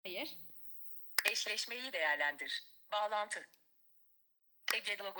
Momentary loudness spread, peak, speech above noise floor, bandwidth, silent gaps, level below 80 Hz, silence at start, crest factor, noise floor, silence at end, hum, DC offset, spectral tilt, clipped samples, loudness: 12 LU; -14 dBFS; 32 dB; over 20 kHz; none; under -90 dBFS; 0.05 s; 28 dB; -71 dBFS; 0 s; none; under 0.1%; 1 dB/octave; under 0.1%; -38 LUFS